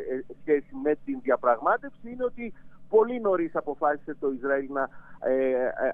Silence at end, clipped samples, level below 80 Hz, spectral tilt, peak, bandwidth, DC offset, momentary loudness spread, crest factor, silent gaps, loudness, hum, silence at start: 0 s; under 0.1%; -58 dBFS; -9 dB/octave; -10 dBFS; 3.7 kHz; under 0.1%; 10 LU; 18 dB; none; -27 LUFS; none; 0 s